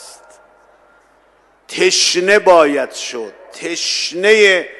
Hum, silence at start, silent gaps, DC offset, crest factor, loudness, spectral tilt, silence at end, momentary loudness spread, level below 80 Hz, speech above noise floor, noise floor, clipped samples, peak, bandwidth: none; 0 s; none; under 0.1%; 16 dB; -13 LUFS; -1.5 dB/octave; 0.05 s; 18 LU; -58 dBFS; 39 dB; -53 dBFS; under 0.1%; 0 dBFS; 12.5 kHz